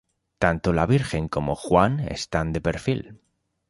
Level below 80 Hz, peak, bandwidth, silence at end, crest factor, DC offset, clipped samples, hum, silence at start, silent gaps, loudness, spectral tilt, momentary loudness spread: -40 dBFS; -2 dBFS; 11.5 kHz; 0.55 s; 22 dB; under 0.1%; under 0.1%; none; 0.4 s; none; -24 LUFS; -6.5 dB/octave; 7 LU